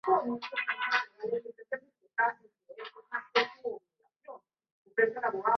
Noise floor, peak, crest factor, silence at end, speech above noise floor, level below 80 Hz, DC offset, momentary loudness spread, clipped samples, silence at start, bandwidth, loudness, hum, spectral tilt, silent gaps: -71 dBFS; -12 dBFS; 20 dB; 0 s; 40 dB; -82 dBFS; under 0.1%; 21 LU; under 0.1%; 0.05 s; 6.4 kHz; -32 LUFS; none; 0 dB/octave; 4.72-4.85 s